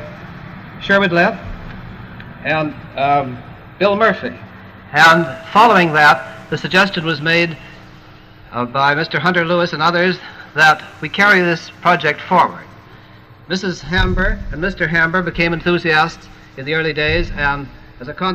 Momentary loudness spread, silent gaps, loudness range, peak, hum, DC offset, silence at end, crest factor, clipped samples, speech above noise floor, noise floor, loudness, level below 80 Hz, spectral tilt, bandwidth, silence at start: 22 LU; none; 6 LU; -2 dBFS; none; 0.1%; 0 s; 16 dB; under 0.1%; 26 dB; -41 dBFS; -15 LUFS; -32 dBFS; -5 dB/octave; 15.5 kHz; 0 s